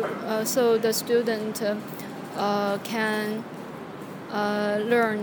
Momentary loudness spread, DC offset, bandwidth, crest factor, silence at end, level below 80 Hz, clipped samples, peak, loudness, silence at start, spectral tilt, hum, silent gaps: 15 LU; under 0.1%; 19.5 kHz; 18 dB; 0 s; -72 dBFS; under 0.1%; -8 dBFS; -26 LUFS; 0 s; -4 dB/octave; none; none